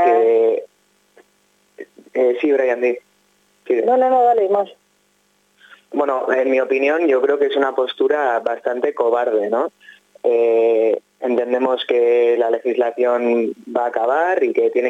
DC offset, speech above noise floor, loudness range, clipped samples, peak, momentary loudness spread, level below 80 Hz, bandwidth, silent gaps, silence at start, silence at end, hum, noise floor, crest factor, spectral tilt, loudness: under 0.1%; 44 dB; 2 LU; under 0.1%; -4 dBFS; 7 LU; -82 dBFS; 7.6 kHz; none; 0 s; 0 s; 50 Hz at -65 dBFS; -61 dBFS; 14 dB; -5 dB/octave; -18 LUFS